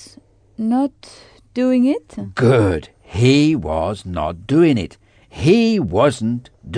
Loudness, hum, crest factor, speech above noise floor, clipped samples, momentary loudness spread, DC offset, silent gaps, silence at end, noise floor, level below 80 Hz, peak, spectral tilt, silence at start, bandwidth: -17 LUFS; none; 16 dB; 31 dB; under 0.1%; 12 LU; under 0.1%; none; 0 s; -48 dBFS; -42 dBFS; -2 dBFS; -7 dB/octave; 0 s; 10 kHz